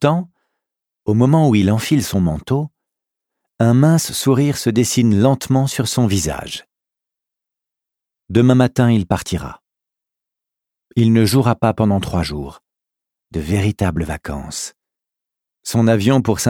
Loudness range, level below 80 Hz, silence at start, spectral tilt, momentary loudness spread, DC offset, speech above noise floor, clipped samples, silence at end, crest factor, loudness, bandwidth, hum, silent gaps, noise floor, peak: 5 LU; -40 dBFS; 0 s; -6 dB/octave; 14 LU; under 0.1%; 70 dB; under 0.1%; 0 s; 16 dB; -16 LUFS; 18.5 kHz; none; none; -85 dBFS; 0 dBFS